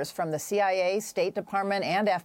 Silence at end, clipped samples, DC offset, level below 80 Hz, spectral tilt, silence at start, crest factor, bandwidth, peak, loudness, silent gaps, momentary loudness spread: 0 s; under 0.1%; under 0.1%; -74 dBFS; -4 dB/octave; 0 s; 14 dB; 17 kHz; -14 dBFS; -28 LUFS; none; 5 LU